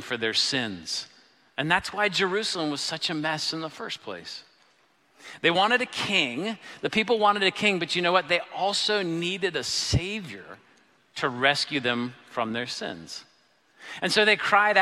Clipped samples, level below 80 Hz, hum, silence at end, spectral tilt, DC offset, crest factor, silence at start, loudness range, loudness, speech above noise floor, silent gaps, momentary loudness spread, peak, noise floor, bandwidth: under 0.1%; -54 dBFS; none; 0 s; -3 dB/octave; under 0.1%; 22 dB; 0 s; 5 LU; -25 LUFS; 37 dB; none; 16 LU; -6 dBFS; -64 dBFS; 14.5 kHz